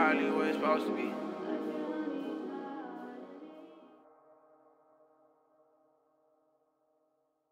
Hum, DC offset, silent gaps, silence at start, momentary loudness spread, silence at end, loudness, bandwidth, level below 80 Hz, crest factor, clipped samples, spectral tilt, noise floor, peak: none; under 0.1%; none; 0 s; 20 LU; 3.55 s; -35 LUFS; 15.5 kHz; -88 dBFS; 22 dB; under 0.1%; -6 dB/octave; -77 dBFS; -14 dBFS